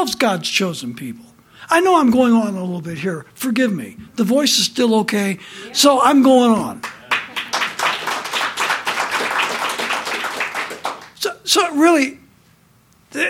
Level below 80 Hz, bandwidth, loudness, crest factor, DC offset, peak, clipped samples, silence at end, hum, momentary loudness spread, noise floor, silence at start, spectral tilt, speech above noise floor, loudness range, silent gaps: -60 dBFS; 17 kHz; -17 LUFS; 18 dB; under 0.1%; 0 dBFS; under 0.1%; 0 s; none; 13 LU; -53 dBFS; 0 s; -3.5 dB/octave; 37 dB; 5 LU; none